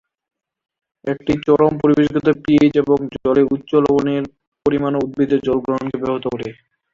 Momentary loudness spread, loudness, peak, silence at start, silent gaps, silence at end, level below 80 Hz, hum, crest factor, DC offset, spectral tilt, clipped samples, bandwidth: 10 LU; -17 LUFS; -2 dBFS; 1.05 s; 4.47-4.52 s; 0.4 s; -50 dBFS; none; 16 dB; under 0.1%; -8 dB/octave; under 0.1%; 7.2 kHz